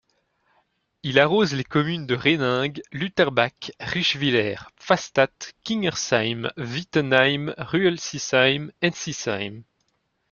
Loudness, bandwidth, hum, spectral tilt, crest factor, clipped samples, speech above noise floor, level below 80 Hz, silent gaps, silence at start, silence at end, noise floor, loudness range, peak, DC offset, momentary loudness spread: -22 LUFS; 7.4 kHz; none; -4.5 dB/octave; 22 dB; under 0.1%; 49 dB; -60 dBFS; none; 1.05 s; 0.7 s; -72 dBFS; 1 LU; -2 dBFS; under 0.1%; 10 LU